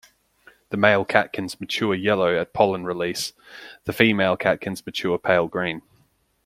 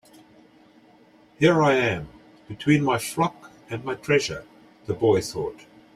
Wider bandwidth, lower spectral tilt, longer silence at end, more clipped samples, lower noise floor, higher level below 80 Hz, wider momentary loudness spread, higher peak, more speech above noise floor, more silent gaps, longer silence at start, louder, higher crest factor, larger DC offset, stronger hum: about the same, 16 kHz vs 15.5 kHz; about the same, -5 dB/octave vs -5.5 dB/octave; first, 0.65 s vs 0.4 s; neither; first, -63 dBFS vs -55 dBFS; about the same, -60 dBFS vs -56 dBFS; second, 13 LU vs 17 LU; first, 0 dBFS vs -6 dBFS; first, 41 dB vs 32 dB; neither; second, 0.7 s vs 1.4 s; about the same, -22 LUFS vs -23 LUFS; about the same, 22 dB vs 20 dB; neither; neither